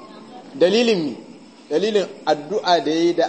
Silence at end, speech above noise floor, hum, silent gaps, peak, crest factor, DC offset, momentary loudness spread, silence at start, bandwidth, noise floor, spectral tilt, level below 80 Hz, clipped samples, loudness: 0 s; 21 dB; none; none; -4 dBFS; 16 dB; under 0.1%; 21 LU; 0 s; 8.6 kHz; -40 dBFS; -4.5 dB/octave; -74 dBFS; under 0.1%; -20 LUFS